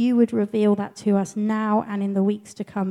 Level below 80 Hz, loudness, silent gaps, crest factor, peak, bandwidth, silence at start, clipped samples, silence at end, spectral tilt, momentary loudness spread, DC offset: -70 dBFS; -23 LUFS; none; 14 dB; -6 dBFS; 11 kHz; 0 s; under 0.1%; 0 s; -7.5 dB/octave; 6 LU; under 0.1%